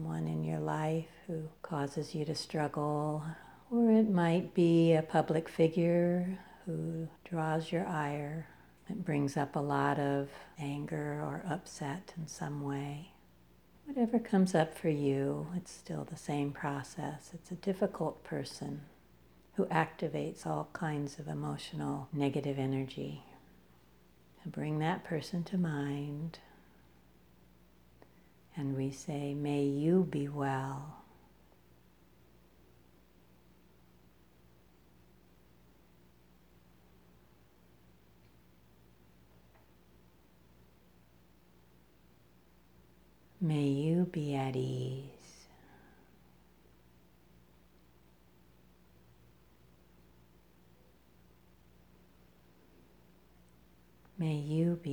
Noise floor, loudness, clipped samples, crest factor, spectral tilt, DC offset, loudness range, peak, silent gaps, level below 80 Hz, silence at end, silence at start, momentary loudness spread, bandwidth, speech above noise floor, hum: -65 dBFS; -35 LUFS; under 0.1%; 24 dB; -7 dB/octave; under 0.1%; 11 LU; -12 dBFS; none; -68 dBFS; 0 s; 0 s; 14 LU; 20 kHz; 31 dB; none